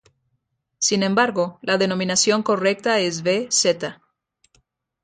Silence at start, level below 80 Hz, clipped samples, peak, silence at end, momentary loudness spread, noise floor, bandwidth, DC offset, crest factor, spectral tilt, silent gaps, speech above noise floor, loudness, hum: 0.8 s; -66 dBFS; under 0.1%; -4 dBFS; 1.1 s; 5 LU; -73 dBFS; 9.6 kHz; under 0.1%; 18 dB; -3 dB/octave; none; 53 dB; -20 LUFS; none